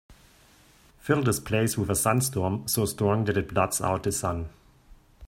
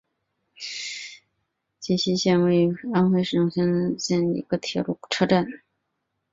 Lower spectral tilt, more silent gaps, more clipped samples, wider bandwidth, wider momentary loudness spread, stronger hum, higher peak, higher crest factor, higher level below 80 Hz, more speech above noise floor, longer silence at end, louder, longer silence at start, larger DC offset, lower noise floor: about the same, -5 dB/octave vs -5.5 dB/octave; neither; neither; first, 16.5 kHz vs 7.8 kHz; second, 6 LU vs 13 LU; neither; about the same, -8 dBFS vs -6 dBFS; about the same, 20 dB vs 18 dB; first, -52 dBFS vs -62 dBFS; second, 31 dB vs 56 dB; second, 0 s vs 0.75 s; second, -26 LUFS vs -23 LUFS; second, 0.1 s vs 0.6 s; neither; second, -57 dBFS vs -78 dBFS